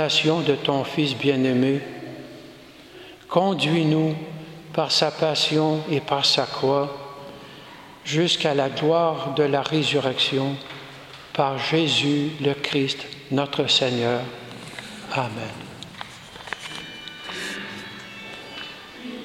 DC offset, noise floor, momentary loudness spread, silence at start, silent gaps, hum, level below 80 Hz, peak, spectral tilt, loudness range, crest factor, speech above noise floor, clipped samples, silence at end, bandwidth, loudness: under 0.1%; -45 dBFS; 18 LU; 0 s; none; none; -62 dBFS; -4 dBFS; -4.5 dB/octave; 10 LU; 20 dB; 23 dB; under 0.1%; 0 s; 15.5 kHz; -22 LUFS